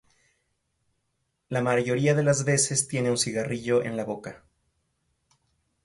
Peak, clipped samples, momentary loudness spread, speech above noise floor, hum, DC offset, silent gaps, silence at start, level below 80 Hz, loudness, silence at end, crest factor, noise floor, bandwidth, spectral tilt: -10 dBFS; under 0.1%; 10 LU; 52 dB; none; under 0.1%; none; 1.5 s; -64 dBFS; -25 LUFS; 1.5 s; 18 dB; -77 dBFS; 11.5 kHz; -4.5 dB/octave